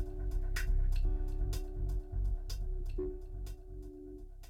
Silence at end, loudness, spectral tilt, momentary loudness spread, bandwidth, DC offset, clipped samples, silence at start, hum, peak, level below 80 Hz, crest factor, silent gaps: 0 s; -40 LUFS; -6 dB/octave; 13 LU; 14.5 kHz; under 0.1%; under 0.1%; 0 s; none; -22 dBFS; -36 dBFS; 12 dB; none